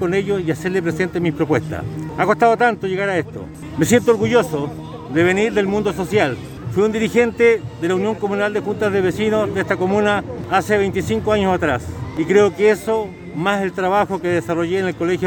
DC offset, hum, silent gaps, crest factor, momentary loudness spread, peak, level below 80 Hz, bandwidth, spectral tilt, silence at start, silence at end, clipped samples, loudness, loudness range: under 0.1%; none; none; 16 dB; 8 LU; -2 dBFS; -44 dBFS; 19 kHz; -6 dB/octave; 0 s; 0 s; under 0.1%; -18 LUFS; 1 LU